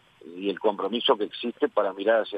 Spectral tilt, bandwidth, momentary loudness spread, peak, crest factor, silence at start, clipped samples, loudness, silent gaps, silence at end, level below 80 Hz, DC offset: -6 dB/octave; 5.2 kHz; 8 LU; -8 dBFS; 18 dB; 0.25 s; under 0.1%; -26 LUFS; none; 0 s; -78 dBFS; under 0.1%